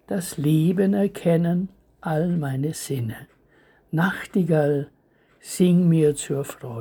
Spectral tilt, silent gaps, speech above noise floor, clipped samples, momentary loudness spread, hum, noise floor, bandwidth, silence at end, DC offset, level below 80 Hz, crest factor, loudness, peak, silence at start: -7 dB/octave; none; 38 dB; under 0.1%; 14 LU; none; -60 dBFS; over 20 kHz; 0 s; under 0.1%; -58 dBFS; 16 dB; -22 LUFS; -6 dBFS; 0.1 s